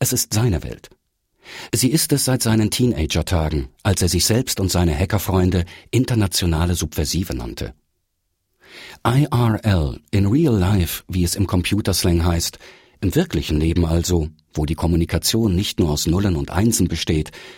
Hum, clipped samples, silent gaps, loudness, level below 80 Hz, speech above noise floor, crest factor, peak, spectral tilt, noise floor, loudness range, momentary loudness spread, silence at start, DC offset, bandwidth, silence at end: none; under 0.1%; none; -19 LUFS; -32 dBFS; 53 dB; 16 dB; -4 dBFS; -5 dB/octave; -72 dBFS; 4 LU; 8 LU; 0 s; under 0.1%; 16.5 kHz; 0 s